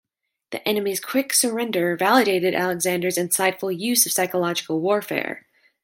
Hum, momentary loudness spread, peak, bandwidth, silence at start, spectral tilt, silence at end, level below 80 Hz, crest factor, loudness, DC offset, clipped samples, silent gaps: none; 9 LU; -4 dBFS; 17 kHz; 0.5 s; -3 dB/octave; 0.45 s; -72 dBFS; 18 dB; -21 LUFS; under 0.1%; under 0.1%; none